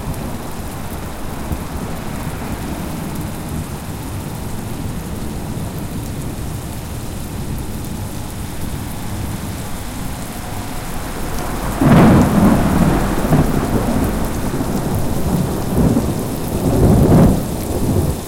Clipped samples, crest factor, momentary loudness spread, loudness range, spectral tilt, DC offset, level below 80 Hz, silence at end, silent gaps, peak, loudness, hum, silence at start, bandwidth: under 0.1%; 16 dB; 14 LU; 11 LU; -6.5 dB/octave; under 0.1%; -26 dBFS; 0 s; none; -2 dBFS; -19 LUFS; none; 0 s; 17 kHz